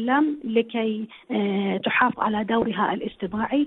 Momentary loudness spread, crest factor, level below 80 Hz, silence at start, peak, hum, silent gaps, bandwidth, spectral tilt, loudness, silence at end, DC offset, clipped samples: 8 LU; 18 dB; -58 dBFS; 0 s; -6 dBFS; none; none; 4.1 kHz; -9.5 dB/octave; -24 LUFS; 0 s; under 0.1%; under 0.1%